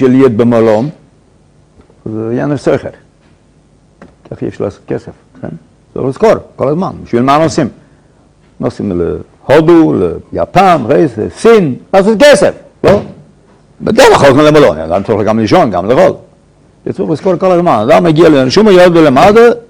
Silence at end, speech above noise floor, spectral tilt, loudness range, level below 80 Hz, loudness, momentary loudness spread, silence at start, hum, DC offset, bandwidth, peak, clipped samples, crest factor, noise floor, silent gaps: 0.1 s; 38 dB; -6 dB/octave; 11 LU; -38 dBFS; -8 LUFS; 16 LU; 0 s; none; under 0.1%; 16.5 kHz; 0 dBFS; 6%; 10 dB; -46 dBFS; none